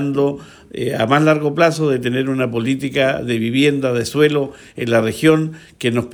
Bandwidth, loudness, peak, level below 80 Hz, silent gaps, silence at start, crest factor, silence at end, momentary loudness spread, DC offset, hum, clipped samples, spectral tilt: over 20 kHz; -17 LUFS; -2 dBFS; -54 dBFS; none; 0 s; 16 dB; 0 s; 9 LU; under 0.1%; none; under 0.1%; -6 dB/octave